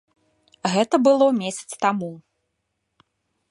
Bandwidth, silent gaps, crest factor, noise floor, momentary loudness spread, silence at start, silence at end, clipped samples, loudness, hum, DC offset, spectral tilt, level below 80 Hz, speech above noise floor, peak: 11.5 kHz; none; 20 dB; -76 dBFS; 13 LU; 0.65 s; 1.3 s; under 0.1%; -21 LUFS; none; under 0.1%; -5 dB/octave; -74 dBFS; 56 dB; -4 dBFS